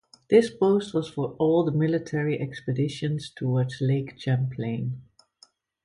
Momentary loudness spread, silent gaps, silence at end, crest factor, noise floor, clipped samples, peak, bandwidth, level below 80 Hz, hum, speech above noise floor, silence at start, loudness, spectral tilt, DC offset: 9 LU; none; 0.85 s; 20 dB; -60 dBFS; under 0.1%; -6 dBFS; 11 kHz; -62 dBFS; none; 35 dB; 0.3 s; -26 LUFS; -7.5 dB/octave; under 0.1%